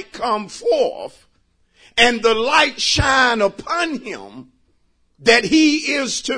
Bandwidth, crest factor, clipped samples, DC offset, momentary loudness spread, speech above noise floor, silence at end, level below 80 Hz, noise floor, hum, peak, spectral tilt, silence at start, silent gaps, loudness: 10.5 kHz; 18 dB; under 0.1%; under 0.1%; 11 LU; 43 dB; 0 s; -42 dBFS; -61 dBFS; none; 0 dBFS; -3 dB/octave; 0 s; none; -16 LUFS